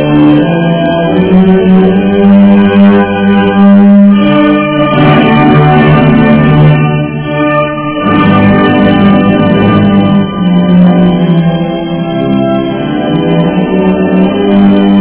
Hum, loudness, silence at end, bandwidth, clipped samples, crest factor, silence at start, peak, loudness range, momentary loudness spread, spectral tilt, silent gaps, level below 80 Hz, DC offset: none; -6 LUFS; 0 s; 4 kHz; 6%; 6 dB; 0 s; 0 dBFS; 4 LU; 6 LU; -11.5 dB/octave; none; -32 dBFS; under 0.1%